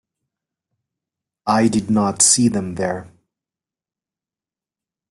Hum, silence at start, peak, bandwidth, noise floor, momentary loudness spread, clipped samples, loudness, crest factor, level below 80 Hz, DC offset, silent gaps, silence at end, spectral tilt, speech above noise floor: none; 1.45 s; 0 dBFS; 12.5 kHz; under -90 dBFS; 13 LU; under 0.1%; -17 LUFS; 22 dB; -56 dBFS; under 0.1%; none; 2.05 s; -3.5 dB/octave; over 73 dB